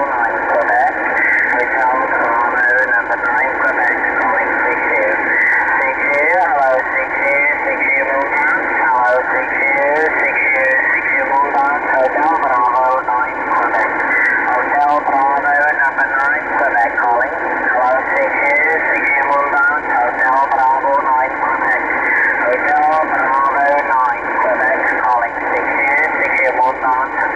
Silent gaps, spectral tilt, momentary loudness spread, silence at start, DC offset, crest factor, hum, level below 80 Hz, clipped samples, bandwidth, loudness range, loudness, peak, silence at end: none; -5 dB/octave; 3 LU; 0 s; 0.1%; 10 dB; none; -48 dBFS; under 0.1%; 10 kHz; 1 LU; -13 LUFS; -4 dBFS; 0 s